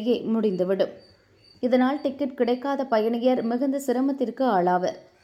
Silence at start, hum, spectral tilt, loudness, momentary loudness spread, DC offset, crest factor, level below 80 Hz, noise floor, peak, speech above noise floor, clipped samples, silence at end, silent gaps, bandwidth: 0 s; none; -6.5 dB/octave; -24 LUFS; 5 LU; under 0.1%; 16 dB; -72 dBFS; -56 dBFS; -10 dBFS; 33 dB; under 0.1%; 0.2 s; none; 15.5 kHz